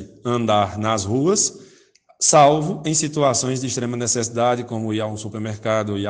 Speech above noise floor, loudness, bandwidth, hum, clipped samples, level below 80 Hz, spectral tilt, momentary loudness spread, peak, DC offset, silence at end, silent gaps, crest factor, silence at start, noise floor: 34 dB; -20 LUFS; 10 kHz; none; under 0.1%; -58 dBFS; -4 dB/octave; 10 LU; -2 dBFS; under 0.1%; 0 s; none; 18 dB; 0 s; -54 dBFS